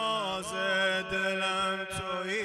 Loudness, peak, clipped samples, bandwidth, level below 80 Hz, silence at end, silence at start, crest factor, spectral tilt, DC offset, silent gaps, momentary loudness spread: -30 LUFS; -18 dBFS; under 0.1%; 14.5 kHz; -60 dBFS; 0 s; 0 s; 14 dB; -3 dB/octave; under 0.1%; none; 6 LU